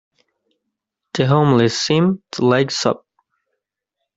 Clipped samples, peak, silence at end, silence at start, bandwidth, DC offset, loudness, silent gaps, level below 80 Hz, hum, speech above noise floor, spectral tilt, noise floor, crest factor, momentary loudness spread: under 0.1%; -2 dBFS; 1.2 s; 1.15 s; 8 kHz; under 0.1%; -17 LUFS; none; -56 dBFS; none; 63 dB; -5.5 dB/octave; -79 dBFS; 16 dB; 7 LU